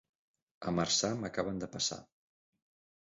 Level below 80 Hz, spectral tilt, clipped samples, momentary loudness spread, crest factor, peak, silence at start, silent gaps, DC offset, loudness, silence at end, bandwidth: -64 dBFS; -3.5 dB/octave; under 0.1%; 10 LU; 20 dB; -18 dBFS; 0.6 s; none; under 0.1%; -34 LUFS; 1 s; 7.6 kHz